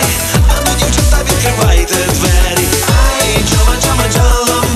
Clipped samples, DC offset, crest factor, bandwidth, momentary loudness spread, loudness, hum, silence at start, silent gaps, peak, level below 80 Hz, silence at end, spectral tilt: under 0.1%; under 0.1%; 10 dB; 13.5 kHz; 1 LU; -11 LUFS; none; 0 s; none; 0 dBFS; -14 dBFS; 0 s; -3.5 dB/octave